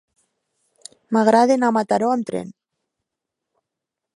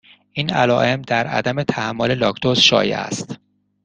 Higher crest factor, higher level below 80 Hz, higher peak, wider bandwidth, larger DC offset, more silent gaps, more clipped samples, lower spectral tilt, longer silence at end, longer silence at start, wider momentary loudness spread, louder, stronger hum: about the same, 20 dB vs 20 dB; second, -70 dBFS vs -54 dBFS; about the same, -2 dBFS vs 0 dBFS; first, 11.5 kHz vs 10 kHz; neither; neither; neither; first, -5.5 dB/octave vs -4 dB/octave; first, 1.65 s vs 0.5 s; first, 1.1 s vs 0.35 s; about the same, 14 LU vs 14 LU; about the same, -18 LUFS vs -18 LUFS; neither